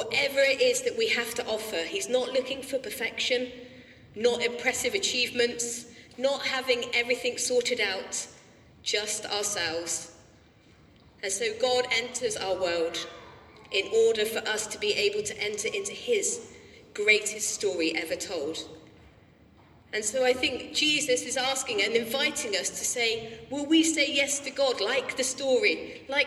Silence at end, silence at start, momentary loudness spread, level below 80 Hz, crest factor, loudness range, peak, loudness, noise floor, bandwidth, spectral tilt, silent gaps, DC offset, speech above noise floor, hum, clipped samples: 0 s; 0 s; 10 LU; -64 dBFS; 20 dB; 4 LU; -8 dBFS; -27 LUFS; -57 dBFS; 15 kHz; -1 dB/octave; none; under 0.1%; 29 dB; none; under 0.1%